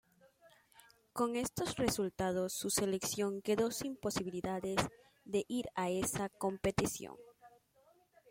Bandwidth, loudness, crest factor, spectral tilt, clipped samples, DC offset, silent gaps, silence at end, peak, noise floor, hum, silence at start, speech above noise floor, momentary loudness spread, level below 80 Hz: 16.5 kHz; -37 LUFS; 22 dB; -4 dB/octave; under 0.1%; under 0.1%; none; 0.8 s; -16 dBFS; -70 dBFS; none; 0.45 s; 33 dB; 5 LU; -62 dBFS